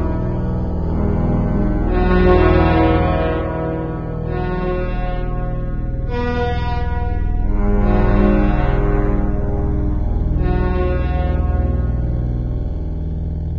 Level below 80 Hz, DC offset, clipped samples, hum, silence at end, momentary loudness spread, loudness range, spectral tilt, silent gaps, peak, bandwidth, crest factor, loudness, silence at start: -20 dBFS; under 0.1%; under 0.1%; 60 Hz at -30 dBFS; 0 s; 10 LU; 6 LU; -10 dB/octave; none; 0 dBFS; 5.4 kHz; 16 dB; -19 LUFS; 0 s